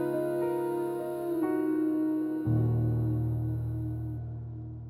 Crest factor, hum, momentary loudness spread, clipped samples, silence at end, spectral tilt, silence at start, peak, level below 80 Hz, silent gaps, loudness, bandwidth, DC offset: 12 dB; none; 9 LU; under 0.1%; 0 s; -10 dB/octave; 0 s; -18 dBFS; -50 dBFS; none; -31 LUFS; 13.5 kHz; under 0.1%